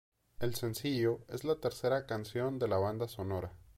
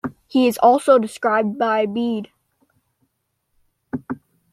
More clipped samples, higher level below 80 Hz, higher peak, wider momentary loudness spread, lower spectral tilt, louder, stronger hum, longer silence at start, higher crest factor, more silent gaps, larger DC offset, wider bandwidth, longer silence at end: neither; about the same, -62 dBFS vs -64 dBFS; second, -20 dBFS vs -2 dBFS; second, 6 LU vs 18 LU; about the same, -6 dB/octave vs -5.5 dB/octave; second, -36 LUFS vs -18 LUFS; neither; first, 0.4 s vs 0.05 s; about the same, 16 dB vs 18 dB; neither; neither; first, 16.5 kHz vs 14 kHz; second, 0.1 s vs 0.35 s